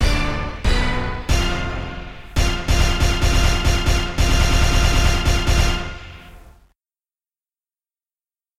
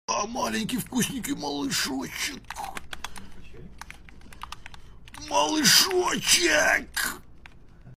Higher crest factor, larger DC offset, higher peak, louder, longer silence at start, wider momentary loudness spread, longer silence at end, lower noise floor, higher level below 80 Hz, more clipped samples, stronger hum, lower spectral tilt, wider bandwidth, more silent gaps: second, 16 dB vs 26 dB; neither; about the same, -2 dBFS vs -2 dBFS; first, -20 LUFS vs -23 LUFS; about the same, 0 s vs 0.1 s; second, 10 LU vs 24 LU; first, 2.1 s vs 0.05 s; first, under -90 dBFS vs -47 dBFS; first, -20 dBFS vs -50 dBFS; neither; neither; first, -4 dB/octave vs -1.5 dB/octave; about the same, 15.5 kHz vs 16 kHz; neither